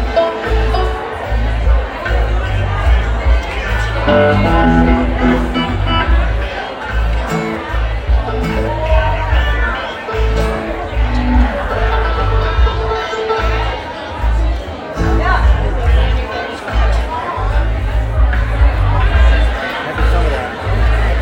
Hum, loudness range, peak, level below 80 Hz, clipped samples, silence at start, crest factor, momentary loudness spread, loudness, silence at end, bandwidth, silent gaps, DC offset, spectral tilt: none; 3 LU; 0 dBFS; -16 dBFS; under 0.1%; 0 s; 12 dB; 7 LU; -16 LUFS; 0 s; 8.4 kHz; none; under 0.1%; -7 dB/octave